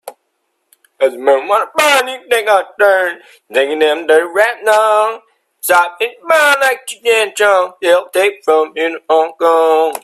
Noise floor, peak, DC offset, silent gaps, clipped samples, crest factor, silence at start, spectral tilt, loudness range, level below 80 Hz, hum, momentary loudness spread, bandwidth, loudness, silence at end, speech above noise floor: -67 dBFS; 0 dBFS; under 0.1%; none; under 0.1%; 14 dB; 0.05 s; -0.5 dB/octave; 1 LU; -66 dBFS; none; 7 LU; 16 kHz; -13 LUFS; 0.05 s; 54 dB